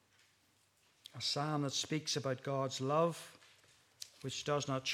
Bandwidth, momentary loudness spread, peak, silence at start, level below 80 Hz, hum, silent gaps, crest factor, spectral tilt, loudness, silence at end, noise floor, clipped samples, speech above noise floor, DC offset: 15.5 kHz; 18 LU; -20 dBFS; 1.15 s; -82 dBFS; none; none; 20 dB; -4 dB/octave; -37 LUFS; 0 s; -73 dBFS; under 0.1%; 36 dB; under 0.1%